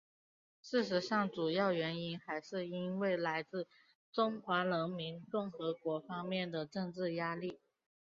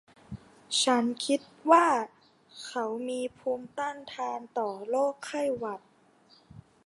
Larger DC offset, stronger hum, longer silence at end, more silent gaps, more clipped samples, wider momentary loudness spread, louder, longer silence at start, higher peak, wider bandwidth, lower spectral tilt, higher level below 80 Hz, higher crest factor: neither; neither; first, 0.45 s vs 0.25 s; first, 3.95-4.12 s vs none; neither; second, 9 LU vs 20 LU; second, -38 LUFS vs -29 LUFS; first, 0.65 s vs 0.3 s; second, -20 dBFS vs -6 dBFS; second, 7.4 kHz vs 11.5 kHz; about the same, -4 dB/octave vs -3 dB/octave; second, -82 dBFS vs -68 dBFS; second, 18 dB vs 24 dB